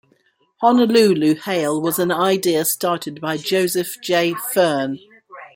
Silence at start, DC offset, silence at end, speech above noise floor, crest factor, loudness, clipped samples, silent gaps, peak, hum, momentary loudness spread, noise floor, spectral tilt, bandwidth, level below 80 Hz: 0.6 s; under 0.1%; 0.1 s; 43 dB; 16 dB; -18 LUFS; under 0.1%; none; -2 dBFS; none; 10 LU; -61 dBFS; -4 dB/octave; 17 kHz; -66 dBFS